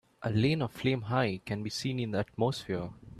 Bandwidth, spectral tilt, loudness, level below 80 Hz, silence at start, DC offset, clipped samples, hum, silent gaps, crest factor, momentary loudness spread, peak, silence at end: 13.5 kHz; -6 dB/octave; -32 LUFS; -60 dBFS; 0.2 s; under 0.1%; under 0.1%; none; none; 18 dB; 7 LU; -14 dBFS; 0 s